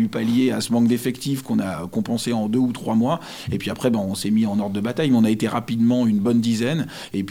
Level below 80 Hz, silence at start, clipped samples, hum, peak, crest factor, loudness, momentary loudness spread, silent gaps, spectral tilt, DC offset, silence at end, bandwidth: -56 dBFS; 0 s; under 0.1%; none; -6 dBFS; 14 dB; -21 LUFS; 8 LU; none; -6 dB/octave; under 0.1%; 0 s; 16 kHz